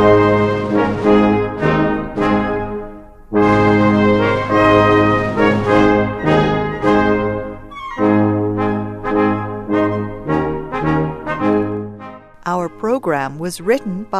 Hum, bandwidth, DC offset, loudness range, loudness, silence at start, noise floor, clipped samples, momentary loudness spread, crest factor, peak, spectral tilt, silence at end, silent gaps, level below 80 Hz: none; 12.5 kHz; under 0.1%; 7 LU; -16 LUFS; 0 s; -35 dBFS; under 0.1%; 11 LU; 16 dB; 0 dBFS; -7.5 dB/octave; 0 s; none; -36 dBFS